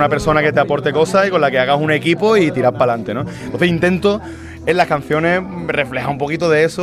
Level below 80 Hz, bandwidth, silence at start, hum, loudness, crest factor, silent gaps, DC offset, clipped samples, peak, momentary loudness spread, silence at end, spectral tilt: -44 dBFS; 14 kHz; 0 s; none; -16 LUFS; 14 dB; none; under 0.1%; under 0.1%; -2 dBFS; 7 LU; 0 s; -6 dB/octave